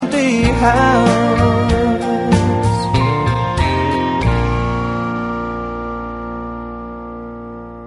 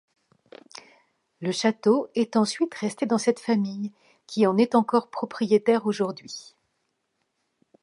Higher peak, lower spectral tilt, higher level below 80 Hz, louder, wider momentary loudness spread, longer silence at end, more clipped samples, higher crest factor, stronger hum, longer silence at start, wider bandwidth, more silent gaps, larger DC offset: first, 0 dBFS vs -6 dBFS; about the same, -6.5 dB/octave vs -5.5 dB/octave; first, -28 dBFS vs -76 dBFS; first, -16 LUFS vs -24 LUFS; about the same, 16 LU vs 17 LU; second, 0 s vs 1.4 s; neither; about the same, 16 dB vs 18 dB; neither; second, 0 s vs 1.4 s; about the same, 11.5 kHz vs 11 kHz; neither; neither